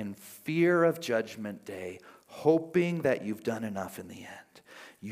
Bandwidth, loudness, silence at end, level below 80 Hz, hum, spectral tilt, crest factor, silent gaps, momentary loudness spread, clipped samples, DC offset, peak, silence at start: 16 kHz; -30 LUFS; 0 s; -76 dBFS; none; -6.5 dB/octave; 20 dB; none; 22 LU; under 0.1%; under 0.1%; -10 dBFS; 0 s